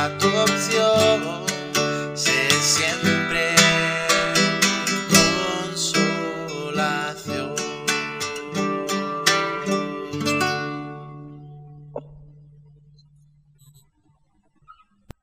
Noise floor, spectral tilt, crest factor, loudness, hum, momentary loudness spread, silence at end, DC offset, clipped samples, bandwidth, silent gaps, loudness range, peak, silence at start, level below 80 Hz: -64 dBFS; -2.5 dB/octave; 22 dB; -20 LUFS; none; 13 LU; 0.5 s; under 0.1%; under 0.1%; 16 kHz; none; 10 LU; 0 dBFS; 0 s; -56 dBFS